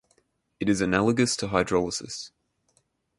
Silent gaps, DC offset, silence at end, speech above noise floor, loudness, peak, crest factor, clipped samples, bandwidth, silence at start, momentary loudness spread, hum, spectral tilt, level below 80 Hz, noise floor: none; under 0.1%; 0.9 s; 45 dB; -25 LUFS; -8 dBFS; 20 dB; under 0.1%; 11.5 kHz; 0.6 s; 14 LU; none; -4.5 dB/octave; -52 dBFS; -70 dBFS